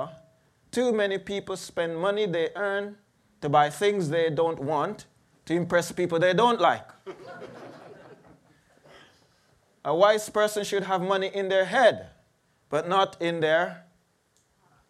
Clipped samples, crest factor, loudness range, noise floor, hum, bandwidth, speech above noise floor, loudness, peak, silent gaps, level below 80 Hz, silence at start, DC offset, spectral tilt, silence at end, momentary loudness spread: under 0.1%; 20 dB; 4 LU; -68 dBFS; none; 14.5 kHz; 43 dB; -25 LUFS; -6 dBFS; none; -68 dBFS; 0 s; under 0.1%; -4.5 dB/octave; 1.1 s; 18 LU